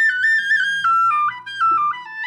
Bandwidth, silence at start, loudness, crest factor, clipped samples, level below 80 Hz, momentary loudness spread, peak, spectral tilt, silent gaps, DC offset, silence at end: 12 kHz; 0 s; -17 LUFS; 8 dB; under 0.1%; -88 dBFS; 6 LU; -10 dBFS; 0 dB/octave; none; under 0.1%; 0 s